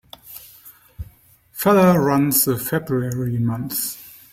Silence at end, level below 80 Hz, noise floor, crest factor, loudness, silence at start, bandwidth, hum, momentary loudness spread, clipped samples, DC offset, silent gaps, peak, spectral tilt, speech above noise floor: 0.2 s; -50 dBFS; -50 dBFS; 18 dB; -19 LUFS; 0.25 s; 16.5 kHz; none; 24 LU; under 0.1%; under 0.1%; none; -4 dBFS; -5.5 dB/octave; 32 dB